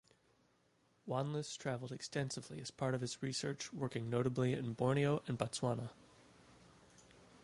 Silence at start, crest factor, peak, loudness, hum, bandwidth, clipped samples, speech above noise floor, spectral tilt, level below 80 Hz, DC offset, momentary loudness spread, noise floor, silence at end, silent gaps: 1.05 s; 22 dB; -18 dBFS; -40 LUFS; none; 11.5 kHz; under 0.1%; 36 dB; -5.5 dB/octave; -72 dBFS; under 0.1%; 8 LU; -75 dBFS; 0.05 s; none